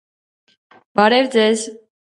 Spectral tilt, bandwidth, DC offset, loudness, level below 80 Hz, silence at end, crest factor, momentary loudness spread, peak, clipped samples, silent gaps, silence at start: -3.5 dB/octave; 11.5 kHz; under 0.1%; -16 LUFS; -66 dBFS; 0.4 s; 18 dB; 10 LU; 0 dBFS; under 0.1%; none; 0.95 s